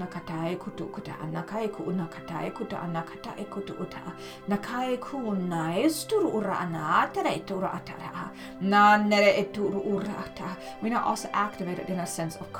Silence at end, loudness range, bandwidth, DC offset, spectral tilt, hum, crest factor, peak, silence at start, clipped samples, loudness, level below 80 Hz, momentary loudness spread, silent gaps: 0 s; 10 LU; 19 kHz; under 0.1%; -5 dB/octave; none; 22 dB; -8 dBFS; 0 s; under 0.1%; -28 LUFS; -62 dBFS; 16 LU; none